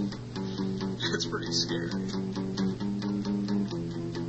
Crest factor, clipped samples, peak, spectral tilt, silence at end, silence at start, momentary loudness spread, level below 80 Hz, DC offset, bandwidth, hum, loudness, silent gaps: 18 dB; under 0.1%; -14 dBFS; -5 dB/octave; 0 s; 0 s; 6 LU; -54 dBFS; under 0.1%; 8.4 kHz; none; -31 LUFS; none